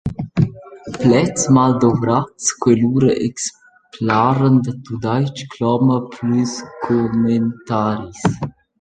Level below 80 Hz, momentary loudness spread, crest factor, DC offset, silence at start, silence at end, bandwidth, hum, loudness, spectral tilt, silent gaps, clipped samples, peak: -46 dBFS; 11 LU; 16 dB; under 0.1%; 0.05 s; 0.3 s; 9.4 kHz; none; -17 LUFS; -6 dB/octave; none; under 0.1%; -2 dBFS